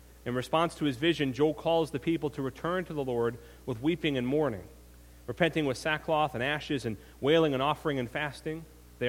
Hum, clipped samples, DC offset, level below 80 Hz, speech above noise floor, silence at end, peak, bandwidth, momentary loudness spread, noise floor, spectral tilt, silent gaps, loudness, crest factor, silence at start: none; under 0.1%; under 0.1%; -54 dBFS; 23 dB; 0 s; -10 dBFS; 16.5 kHz; 11 LU; -53 dBFS; -6 dB/octave; none; -30 LUFS; 20 dB; 0.25 s